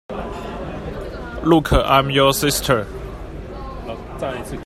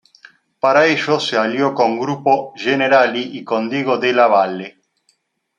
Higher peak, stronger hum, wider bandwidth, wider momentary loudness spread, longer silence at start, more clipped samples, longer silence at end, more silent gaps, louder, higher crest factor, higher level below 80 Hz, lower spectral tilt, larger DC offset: about the same, 0 dBFS vs -2 dBFS; neither; first, 16 kHz vs 9.8 kHz; first, 17 LU vs 9 LU; second, 0.1 s vs 0.65 s; neither; second, 0 s vs 0.9 s; neither; second, -19 LUFS vs -16 LUFS; about the same, 20 dB vs 16 dB; first, -32 dBFS vs -68 dBFS; about the same, -4.5 dB/octave vs -5 dB/octave; neither